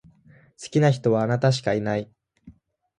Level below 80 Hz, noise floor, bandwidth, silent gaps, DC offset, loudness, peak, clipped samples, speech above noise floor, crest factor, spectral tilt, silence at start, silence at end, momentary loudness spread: -60 dBFS; -54 dBFS; 9.8 kHz; none; under 0.1%; -23 LUFS; -6 dBFS; under 0.1%; 32 dB; 18 dB; -6.5 dB/octave; 0.6 s; 0.45 s; 13 LU